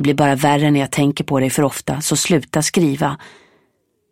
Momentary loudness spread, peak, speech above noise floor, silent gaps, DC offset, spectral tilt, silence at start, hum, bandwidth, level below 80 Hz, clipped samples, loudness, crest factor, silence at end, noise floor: 6 LU; 0 dBFS; 48 dB; none; 0.1%; -5 dB/octave; 0 s; none; 16.5 kHz; -50 dBFS; under 0.1%; -17 LUFS; 16 dB; 0.85 s; -64 dBFS